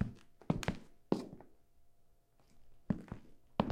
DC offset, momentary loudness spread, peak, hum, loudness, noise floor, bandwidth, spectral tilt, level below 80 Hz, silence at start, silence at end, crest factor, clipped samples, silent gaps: under 0.1%; 15 LU; -14 dBFS; none; -41 LUFS; -67 dBFS; 16 kHz; -7 dB/octave; -56 dBFS; 0 s; 0 s; 28 dB; under 0.1%; none